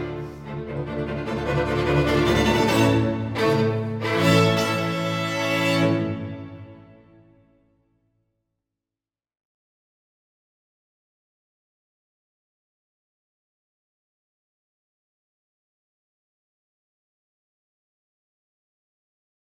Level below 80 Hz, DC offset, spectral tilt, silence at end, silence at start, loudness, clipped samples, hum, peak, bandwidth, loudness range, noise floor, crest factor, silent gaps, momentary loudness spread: -44 dBFS; under 0.1%; -6 dB/octave; 12.65 s; 0 s; -22 LUFS; under 0.1%; none; -4 dBFS; 19 kHz; 8 LU; under -90 dBFS; 22 dB; none; 14 LU